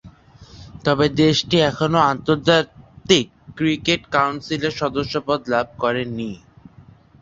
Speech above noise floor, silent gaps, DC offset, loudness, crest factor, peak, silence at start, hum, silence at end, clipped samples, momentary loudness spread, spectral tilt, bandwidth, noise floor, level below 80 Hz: 29 dB; none; under 0.1%; -19 LUFS; 20 dB; 0 dBFS; 0.05 s; none; 0.4 s; under 0.1%; 11 LU; -5 dB/octave; 7.8 kHz; -48 dBFS; -48 dBFS